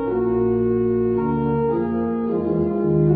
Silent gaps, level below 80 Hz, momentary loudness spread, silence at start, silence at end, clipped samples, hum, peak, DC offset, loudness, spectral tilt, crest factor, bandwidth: none; -42 dBFS; 3 LU; 0 s; 0 s; under 0.1%; none; -8 dBFS; under 0.1%; -21 LUFS; -14 dB/octave; 12 dB; 3.4 kHz